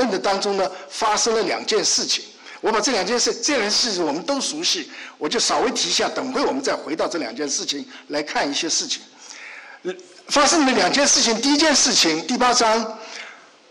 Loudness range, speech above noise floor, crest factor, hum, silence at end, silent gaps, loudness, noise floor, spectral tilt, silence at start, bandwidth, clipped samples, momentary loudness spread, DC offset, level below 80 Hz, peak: 7 LU; 21 dB; 12 dB; none; 0.35 s; none; -19 LUFS; -41 dBFS; -1 dB/octave; 0 s; 12 kHz; under 0.1%; 17 LU; under 0.1%; -58 dBFS; -8 dBFS